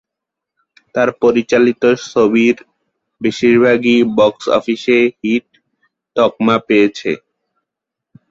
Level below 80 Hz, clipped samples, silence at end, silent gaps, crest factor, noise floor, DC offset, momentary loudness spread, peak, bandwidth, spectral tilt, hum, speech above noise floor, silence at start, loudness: -56 dBFS; under 0.1%; 1.15 s; none; 14 dB; -82 dBFS; under 0.1%; 10 LU; -2 dBFS; 7.6 kHz; -5.5 dB/octave; none; 69 dB; 0.95 s; -14 LUFS